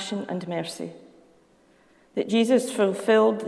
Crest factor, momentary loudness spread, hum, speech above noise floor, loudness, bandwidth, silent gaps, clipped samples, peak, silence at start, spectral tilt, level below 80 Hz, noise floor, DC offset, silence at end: 16 dB; 14 LU; none; 36 dB; -24 LUFS; 11 kHz; none; under 0.1%; -10 dBFS; 0 s; -5 dB/octave; -74 dBFS; -59 dBFS; under 0.1%; 0 s